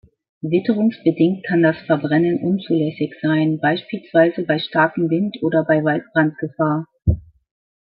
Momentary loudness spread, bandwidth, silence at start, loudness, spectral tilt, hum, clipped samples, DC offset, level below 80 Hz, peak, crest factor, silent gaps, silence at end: 5 LU; 5 kHz; 0.45 s; -19 LUFS; -12 dB/octave; none; under 0.1%; under 0.1%; -40 dBFS; -2 dBFS; 16 dB; none; 0.75 s